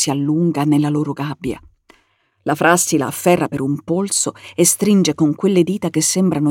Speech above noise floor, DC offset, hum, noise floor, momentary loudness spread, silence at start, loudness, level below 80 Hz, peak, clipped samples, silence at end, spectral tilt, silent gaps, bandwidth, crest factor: 45 dB; under 0.1%; none; -61 dBFS; 9 LU; 0 s; -17 LUFS; -54 dBFS; -2 dBFS; under 0.1%; 0 s; -4.5 dB/octave; none; 17 kHz; 16 dB